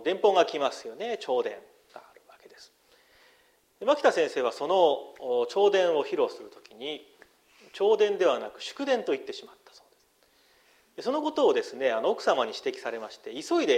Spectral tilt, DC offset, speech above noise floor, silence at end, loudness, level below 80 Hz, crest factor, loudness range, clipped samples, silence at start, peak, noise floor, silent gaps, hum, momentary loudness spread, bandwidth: -3.5 dB/octave; under 0.1%; 38 dB; 0 s; -27 LUFS; -78 dBFS; 20 dB; 6 LU; under 0.1%; 0 s; -10 dBFS; -65 dBFS; none; none; 15 LU; 13 kHz